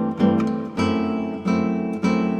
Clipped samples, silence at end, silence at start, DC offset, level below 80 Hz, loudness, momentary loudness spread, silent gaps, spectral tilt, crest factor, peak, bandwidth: under 0.1%; 0 s; 0 s; under 0.1%; -58 dBFS; -22 LUFS; 5 LU; none; -7.5 dB/octave; 14 dB; -6 dBFS; 9 kHz